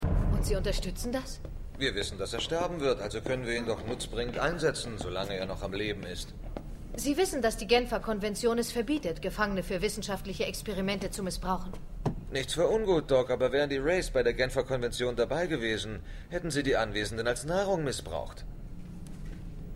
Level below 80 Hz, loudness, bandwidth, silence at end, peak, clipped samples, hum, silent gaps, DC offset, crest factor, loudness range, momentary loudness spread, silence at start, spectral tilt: -40 dBFS; -31 LUFS; 16 kHz; 0 s; -12 dBFS; under 0.1%; none; none; under 0.1%; 18 dB; 4 LU; 15 LU; 0 s; -4.5 dB/octave